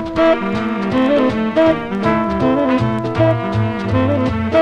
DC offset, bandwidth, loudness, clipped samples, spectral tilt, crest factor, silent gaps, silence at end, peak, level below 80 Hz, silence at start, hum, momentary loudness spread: under 0.1%; 9.4 kHz; -16 LUFS; under 0.1%; -8 dB/octave; 14 dB; none; 0 s; -2 dBFS; -38 dBFS; 0 s; none; 4 LU